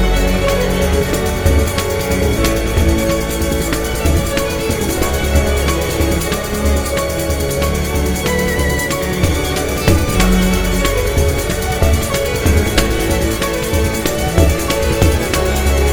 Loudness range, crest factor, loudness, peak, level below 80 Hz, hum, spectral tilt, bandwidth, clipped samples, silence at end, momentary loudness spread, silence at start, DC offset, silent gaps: 1 LU; 14 dB; -16 LUFS; 0 dBFS; -20 dBFS; none; -5 dB/octave; over 20 kHz; under 0.1%; 0 s; 3 LU; 0 s; under 0.1%; none